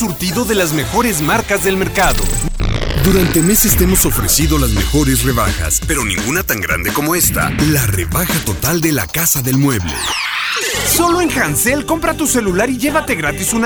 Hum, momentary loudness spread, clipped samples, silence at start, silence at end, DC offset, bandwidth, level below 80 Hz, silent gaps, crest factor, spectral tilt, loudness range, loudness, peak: none; 5 LU; under 0.1%; 0 s; 0 s; under 0.1%; over 20 kHz; -24 dBFS; none; 14 dB; -3.5 dB/octave; 2 LU; -14 LUFS; 0 dBFS